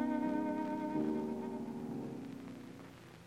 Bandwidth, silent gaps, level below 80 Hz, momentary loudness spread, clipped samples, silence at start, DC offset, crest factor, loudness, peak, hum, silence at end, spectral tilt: 15 kHz; none; -72 dBFS; 15 LU; under 0.1%; 0 s; under 0.1%; 14 dB; -40 LUFS; -24 dBFS; 60 Hz at -65 dBFS; 0 s; -7.5 dB/octave